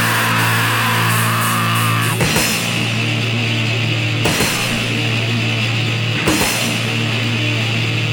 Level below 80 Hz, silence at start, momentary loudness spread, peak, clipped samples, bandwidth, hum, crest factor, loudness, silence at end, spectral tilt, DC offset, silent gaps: -42 dBFS; 0 s; 3 LU; 0 dBFS; under 0.1%; 17.5 kHz; none; 16 dB; -16 LUFS; 0 s; -3.5 dB/octave; under 0.1%; none